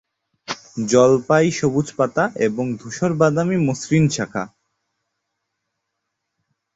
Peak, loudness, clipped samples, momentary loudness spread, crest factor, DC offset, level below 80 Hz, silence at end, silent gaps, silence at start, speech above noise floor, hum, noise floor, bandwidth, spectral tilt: -2 dBFS; -19 LUFS; under 0.1%; 14 LU; 18 dB; under 0.1%; -56 dBFS; 2.3 s; none; 0.5 s; 60 dB; none; -78 dBFS; 8.2 kHz; -6 dB/octave